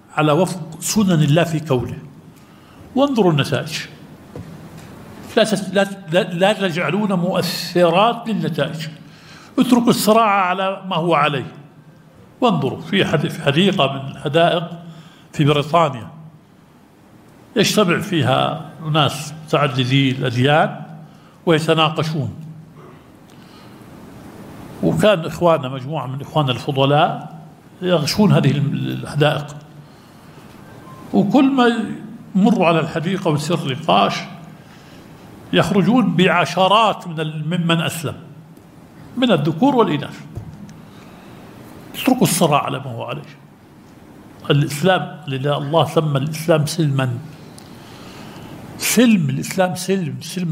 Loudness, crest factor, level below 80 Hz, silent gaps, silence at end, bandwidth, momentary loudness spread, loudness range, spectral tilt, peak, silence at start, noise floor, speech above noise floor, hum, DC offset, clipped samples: -17 LUFS; 18 dB; -54 dBFS; none; 0 s; 16 kHz; 21 LU; 4 LU; -5.5 dB/octave; 0 dBFS; 0.15 s; -48 dBFS; 31 dB; none; under 0.1%; under 0.1%